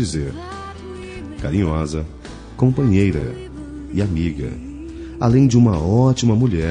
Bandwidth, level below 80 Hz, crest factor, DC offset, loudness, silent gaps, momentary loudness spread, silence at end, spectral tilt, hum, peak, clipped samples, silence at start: 10 kHz; -36 dBFS; 16 dB; under 0.1%; -18 LUFS; none; 18 LU; 0 s; -7.5 dB/octave; none; -2 dBFS; under 0.1%; 0 s